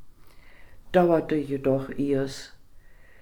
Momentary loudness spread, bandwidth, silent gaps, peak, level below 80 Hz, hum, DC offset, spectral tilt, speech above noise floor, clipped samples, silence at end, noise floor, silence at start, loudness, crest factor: 14 LU; 18.5 kHz; none; -6 dBFS; -50 dBFS; none; under 0.1%; -7 dB/octave; 24 dB; under 0.1%; 0.05 s; -48 dBFS; 0 s; -25 LUFS; 20 dB